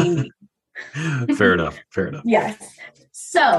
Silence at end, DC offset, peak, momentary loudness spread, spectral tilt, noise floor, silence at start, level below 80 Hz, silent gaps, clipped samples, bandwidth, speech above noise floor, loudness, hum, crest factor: 0 s; under 0.1%; -2 dBFS; 22 LU; -5.5 dB/octave; -49 dBFS; 0 s; -52 dBFS; none; under 0.1%; 12.5 kHz; 29 dB; -21 LUFS; none; 18 dB